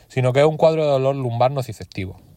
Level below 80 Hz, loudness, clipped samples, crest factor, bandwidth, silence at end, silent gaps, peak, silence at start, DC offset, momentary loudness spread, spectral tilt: -56 dBFS; -18 LUFS; under 0.1%; 16 dB; 15.5 kHz; 0.25 s; none; -4 dBFS; 0.15 s; under 0.1%; 15 LU; -7 dB/octave